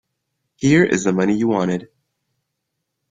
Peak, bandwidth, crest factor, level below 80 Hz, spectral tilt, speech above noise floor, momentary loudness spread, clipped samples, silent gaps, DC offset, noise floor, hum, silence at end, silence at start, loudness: -2 dBFS; 9.4 kHz; 18 dB; -54 dBFS; -6 dB/octave; 60 dB; 8 LU; under 0.1%; none; under 0.1%; -77 dBFS; none; 1.25 s; 0.6 s; -18 LUFS